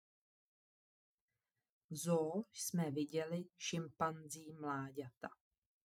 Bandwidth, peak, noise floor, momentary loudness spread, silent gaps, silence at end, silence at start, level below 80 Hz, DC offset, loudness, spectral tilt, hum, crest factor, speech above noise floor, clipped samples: 16.5 kHz; -22 dBFS; under -90 dBFS; 13 LU; 5.17-5.21 s; 0.65 s; 1.9 s; -88 dBFS; under 0.1%; -42 LUFS; -5 dB/octave; none; 22 dB; over 48 dB; under 0.1%